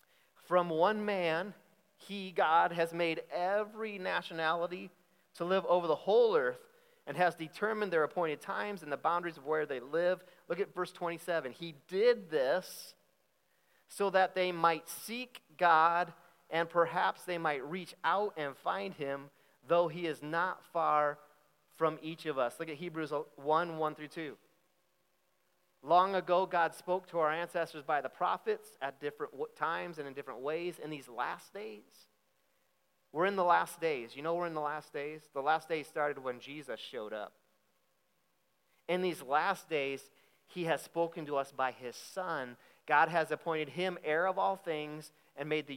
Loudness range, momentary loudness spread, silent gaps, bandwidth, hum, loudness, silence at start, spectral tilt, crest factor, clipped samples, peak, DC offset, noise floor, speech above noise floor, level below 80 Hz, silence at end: 6 LU; 14 LU; none; 16.5 kHz; none; -34 LUFS; 0.5 s; -5 dB/octave; 22 dB; under 0.1%; -14 dBFS; under 0.1%; -78 dBFS; 44 dB; under -90 dBFS; 0 s